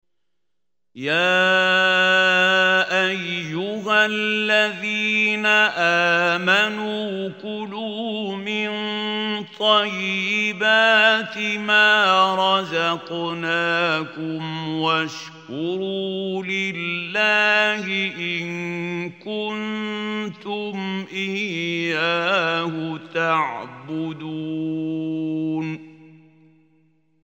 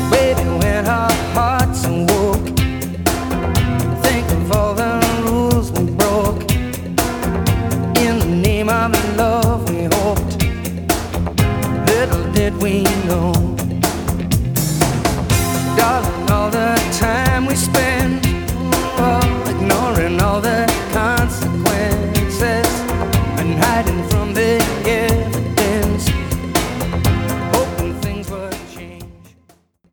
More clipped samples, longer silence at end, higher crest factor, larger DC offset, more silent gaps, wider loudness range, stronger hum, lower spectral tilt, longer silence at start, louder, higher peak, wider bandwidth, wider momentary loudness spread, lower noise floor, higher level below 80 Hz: neither; first, 1.15 s vs 0.8 s; about the same, 18 dB vs 16 dB; neither; neither; first, 9 LU vs 1 LU; neither; about the same, -4 dB/octave vs -5 dB/octave; first, 0.95 s vs 0 s; second, -20 LUFS vs -17 LUFS; about the same, -2 dBFS vs 0 dBFS; second, 16 kHz vs over 20 kHz; first, 13 LU vs 4 LU; first, -84 dBFS vs -53 dBFS; second, -76 dBFS vs -26 dBFS